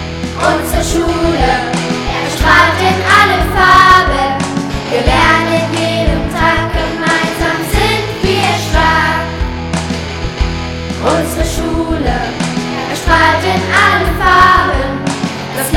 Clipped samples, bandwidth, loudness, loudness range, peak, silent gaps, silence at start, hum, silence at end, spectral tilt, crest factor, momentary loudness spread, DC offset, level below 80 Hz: 0.7%; 19 kHz; -12 LUFS; 6 LU; 0 dBFS; none; 0 s; none; 0 s; -4.5 dB/octave; 12 dB; 10 LU; under 0.1%; -22 dBFS